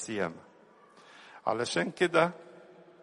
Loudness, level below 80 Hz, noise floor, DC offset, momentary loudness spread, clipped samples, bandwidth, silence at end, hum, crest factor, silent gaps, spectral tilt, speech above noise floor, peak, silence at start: -30 LUFS; -74 dBFS; -59 dBFS; under 0.1%; 24 LU; under 0.1%; 11.5 kHz; 0.4 s; none; 24 dB; none; -4.5 dB/octave; 29 dB; -10 dBFS; 0 s